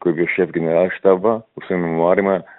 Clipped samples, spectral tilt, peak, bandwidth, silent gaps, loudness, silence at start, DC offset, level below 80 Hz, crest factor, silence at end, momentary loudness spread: under 0.1%; -12 dB/octave; 0 dBFS; 4.1 kHz; none; -18 LUFS; 0 s; under 0.1%; -60 dBFS; 16 dB; 0.15 s; 7 LU